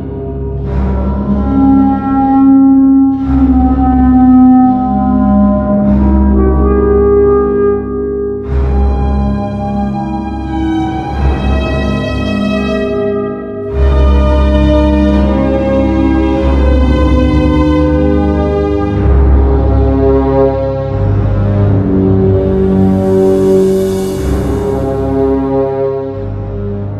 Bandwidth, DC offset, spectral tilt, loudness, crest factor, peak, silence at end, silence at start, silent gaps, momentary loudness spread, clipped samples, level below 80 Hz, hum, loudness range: 9 kHz; under 0.1%; -9 dB/octave; -11 LUFS; 10 dB; 0 dBFS; 0 s; 0 s; none; 8 LU; under 0.1%; -16 dBFS; none; 6 LU